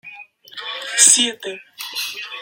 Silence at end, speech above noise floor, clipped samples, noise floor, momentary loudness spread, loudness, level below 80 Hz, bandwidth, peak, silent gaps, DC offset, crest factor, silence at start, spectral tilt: 0 s; 23 dB; under 0.1%; -41 dBFS; 21 LU; -14 LUFS; -80 dBFS; 17 kHz; 0 dBFS; none; under 0.1%; 20 dB; 0.05 s; 2 dB/octave